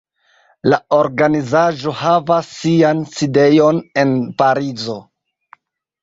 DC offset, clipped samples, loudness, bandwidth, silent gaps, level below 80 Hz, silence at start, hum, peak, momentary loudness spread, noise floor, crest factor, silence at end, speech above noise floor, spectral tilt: under 0.1%; under 0.1%; -15 LUFS; 7.8 kHz; none; -56 dBFS; 0.65 s; none; 0 dBFS; 8 LU; -56 dBFS; 16 dB; 1 s; 41 dB; -6.5 dB/octave